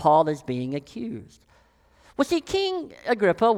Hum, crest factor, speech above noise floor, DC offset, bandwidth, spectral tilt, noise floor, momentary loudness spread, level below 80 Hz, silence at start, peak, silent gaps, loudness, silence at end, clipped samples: none; 18 dB; 35 dB; under 0.1%; 15.5 kHz; -5.5 dB/octave; -59 dBFS; 14 LU; -58 dBFS; 0 s; -6 dBFS; none; -25 LUFS; 0 s; under 0.1%